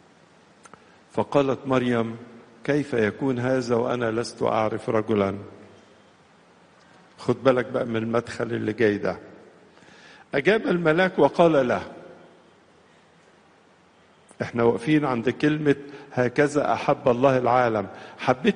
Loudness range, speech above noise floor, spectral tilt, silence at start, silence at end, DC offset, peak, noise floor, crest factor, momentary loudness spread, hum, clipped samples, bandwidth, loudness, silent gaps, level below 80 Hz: 5 LU; 34 dB; -6.5 dB/octave; 1.15 s; 0 s; under 0.1%; -4 dBFS; -56 dBFS; 20 dB; 11 LU; none; under 0.1%; 10 kHz; -23 LUFS; none; -60 dBFS